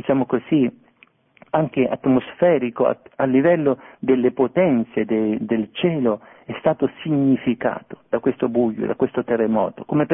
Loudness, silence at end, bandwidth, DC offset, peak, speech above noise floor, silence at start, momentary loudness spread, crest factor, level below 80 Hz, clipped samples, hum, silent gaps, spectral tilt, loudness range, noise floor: -20 LUFS; 0 s; 3.7 kHz; under 0.1%; -2 dBFS; 36 dB; 0.05 s; 6 LU; 18 dB; -58 dBFS; under 0.1%; none; none; -11.5 dB/octave; 3 LU; -56 dBFS